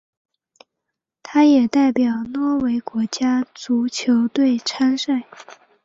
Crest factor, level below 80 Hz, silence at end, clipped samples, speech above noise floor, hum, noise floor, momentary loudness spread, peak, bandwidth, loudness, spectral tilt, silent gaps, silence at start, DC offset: 16 dB; -62 dBFS; 0.3 s; under 0.1%; 63 dB; none; -81 dBFS; 8 LU; -4 dBFS; 7.8 kHz; -19 LUFS; -4 dB/octave; none; 1.25 s; under 0.1%